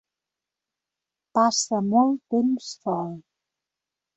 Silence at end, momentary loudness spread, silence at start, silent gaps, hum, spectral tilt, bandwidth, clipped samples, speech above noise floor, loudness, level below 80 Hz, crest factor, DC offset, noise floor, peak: 0.95 s; 9 LU; 1.35 s; none; none; -4.5 dB/octave; 8.4 kHz; under 0.1%; 65 dB; -23 LUFS; -72 dBFS; 18 dB; under 0.1%; -88 dBFS; -8 dBFS